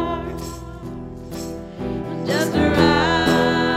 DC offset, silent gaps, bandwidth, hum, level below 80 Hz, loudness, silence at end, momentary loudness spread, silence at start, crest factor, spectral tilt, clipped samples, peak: under 0.1%; none; 16 kHz; none; -38 dBFS; -19 LUFS; 0 s; 17 LU; 0 s; 18 dB; -5.5 dB/octave; under 0.1%; -4 dBFS